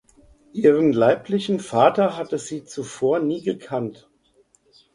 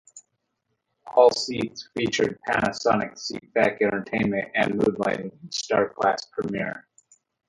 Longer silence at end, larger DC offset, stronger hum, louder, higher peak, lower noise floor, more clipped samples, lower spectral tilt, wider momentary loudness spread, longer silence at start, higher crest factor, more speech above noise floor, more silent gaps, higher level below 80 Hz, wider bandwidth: first, 1 s vs 0.7 s; neither; neither; first, -21 LUFS vs -24 LUFS; about the same, -2 dBFS vs -4 dBFS; second, -60 dBFS vs -77 dBFS; neither; first, -6 dB/octave vs -4.5 dB/octave; about the same, 14 LU vs 12 LU; first, 0.55 s vs 0.15 s; about the same, 20 dB vs 22 dB; second, 40 dB vs 53 dB; neither; about the same, -62 dBFS vs -60 dBFS; about the same, 11 kHz vs 11.5 kHz